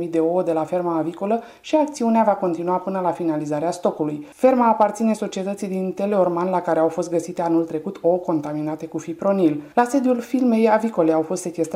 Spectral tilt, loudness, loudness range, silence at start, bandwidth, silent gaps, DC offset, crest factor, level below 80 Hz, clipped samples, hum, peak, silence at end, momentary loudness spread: -6.5 dB/octave; -21 LUFS; 2 LU; 0 s; 15.5 kHz; none; under 0.1%; 16 dB; -66 dBFS; under 0.1%; none; -4 dBFS; 0 s; 8 LU